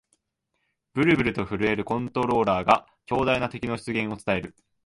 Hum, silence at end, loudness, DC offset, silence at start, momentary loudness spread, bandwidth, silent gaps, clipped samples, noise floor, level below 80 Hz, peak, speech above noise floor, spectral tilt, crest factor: none; 0.35 s; -25 LUFS; under 0.1%; 0.95 s; 8 LU; 11.5 kHz; none; under 0.1%; -77 dBFS; -50 dBFS; -6 dBFS; 53 dB; -6.5 dB/octave; 20 dB